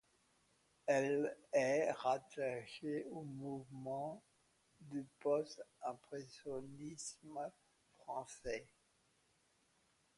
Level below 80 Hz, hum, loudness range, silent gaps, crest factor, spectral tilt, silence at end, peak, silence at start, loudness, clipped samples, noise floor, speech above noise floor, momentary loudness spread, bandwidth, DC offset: -78 dBFS; none; 10 LU; none; 20 dB; -5 dB/octave; 1.5 s; -24 dBFS; 0.85 s; -43 LUFS; under 0.1%; -77 dBFS; 35 dB; 13 LU; 11.5 kHz; under 0.1%